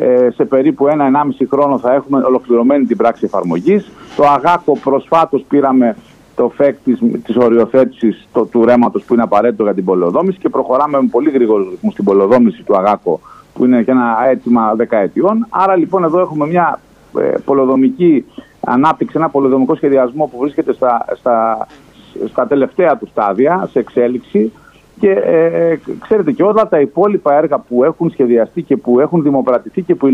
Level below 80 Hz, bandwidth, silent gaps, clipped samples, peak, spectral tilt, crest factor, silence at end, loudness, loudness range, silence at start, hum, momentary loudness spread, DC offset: -54 dBFS; 7 kHz; none; under 0.1%; 0 dBFS; -9 dB/octave; 12 dB; 0 s; -13 LUFS; 2 LU; 0 s; none; 6 LU; under 0.1%